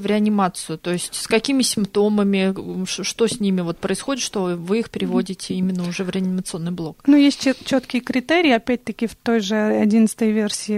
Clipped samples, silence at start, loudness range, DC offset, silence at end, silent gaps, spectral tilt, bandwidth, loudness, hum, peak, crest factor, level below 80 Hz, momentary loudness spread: under 0.1%; 0 s; 4 LU; under 0.1%; 0 s; none; -5 dB/octave; 15 kHz; -20 LUFS; none; -4 dBFS; 16 dB; -54 dBFS; 9 LU